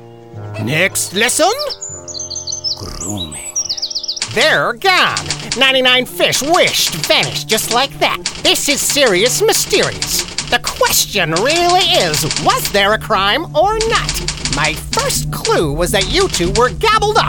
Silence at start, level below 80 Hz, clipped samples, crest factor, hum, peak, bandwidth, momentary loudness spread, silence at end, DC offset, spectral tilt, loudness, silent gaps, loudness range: 0 s; -34 dBFS; under 0.1%; 14 dB; none; 0 dBFS; 18 kHz; 9 LU; 0 s; 0.4%; -2 dB/octave; -13 LUFS; none; 5 LU